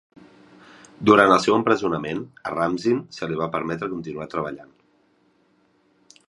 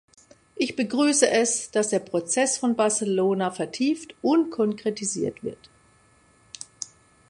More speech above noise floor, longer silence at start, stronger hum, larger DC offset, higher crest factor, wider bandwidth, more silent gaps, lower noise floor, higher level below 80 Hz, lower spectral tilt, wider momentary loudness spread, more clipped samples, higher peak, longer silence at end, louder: first, 41 dB vs 35 dB; first, 1 s vs 0.55 s; neither; neither; about the same, 22 dB vs 20 dB; about the same, 11 kHz vs 11.5 kHz; neither; first, -63 dBFS vs -59 dBFS; first, -58 dBFS vs -68 dBFS; first, -5.5 dB/octave vs -3.5 dB/octave; about the same, 15 LU vs 17 LU; neither; first, 0 dBFS vs -4 dBFS; first, 1.65 s vs 0.45 s; about the same, -22 LUFS vs -24 LUFS